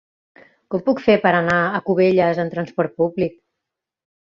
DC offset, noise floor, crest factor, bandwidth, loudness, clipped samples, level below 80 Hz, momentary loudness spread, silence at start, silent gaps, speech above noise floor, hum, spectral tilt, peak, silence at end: under 0.1%; -83 dBFS; 18 dB; 7.4 kHz; -19 LUFS; under 0.1%; -56 dBFS; 9 LU; 0.7 s; none; 65 dB; none; -7.5 dB/octave; -2 dBFS; 0.9 s